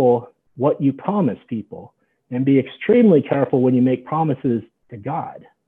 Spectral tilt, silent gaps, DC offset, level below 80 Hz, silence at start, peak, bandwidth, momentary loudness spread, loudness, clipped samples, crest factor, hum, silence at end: -11 dB/octave; none; under 0.1%; -66 dBFS; 0 s; -4 dBFS; 3.8 kHz; 15 LU; -19 LUFS; under 0.1%; 16 dB; none; 0.3 s